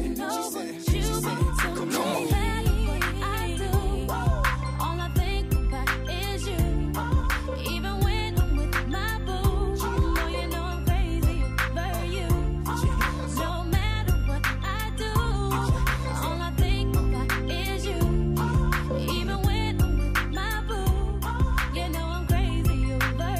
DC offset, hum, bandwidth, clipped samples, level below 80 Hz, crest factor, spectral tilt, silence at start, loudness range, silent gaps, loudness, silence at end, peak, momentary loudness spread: under 0.1%; none; 15.5 kHz; under 0.1%; -28 dBFS; 14 dB; -5.5 dB/octave; 0 s; 1 LU; none; -27 LUFS; 0 s; -10 dBFS; 4 LU